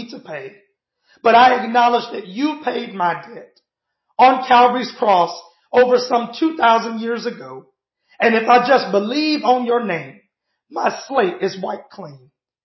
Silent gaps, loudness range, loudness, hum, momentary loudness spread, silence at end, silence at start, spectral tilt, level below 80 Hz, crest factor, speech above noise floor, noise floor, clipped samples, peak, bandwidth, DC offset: none; 3 LU; -16 LUFS; none; 18 LU; 0.5 s; 0 s; -5 dB/octave; -68 dBFS; 16 dB; 55 dB; -72 dBFS; under 0.1%; -2 dBFS; 6.2 kHz; under 0.1%